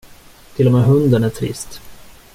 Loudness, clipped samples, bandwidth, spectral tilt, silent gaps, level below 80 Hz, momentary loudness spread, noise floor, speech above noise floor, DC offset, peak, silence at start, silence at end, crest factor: -15 LUFS; under 0.1%; 15.5 kHz; -7.5 dB/octave; none; -44 dBFS; 18 LU; -42 dBFS; 28 dB; under 0.1%; -2 dBFS; 0.55 s; 0.4 s; 14 dB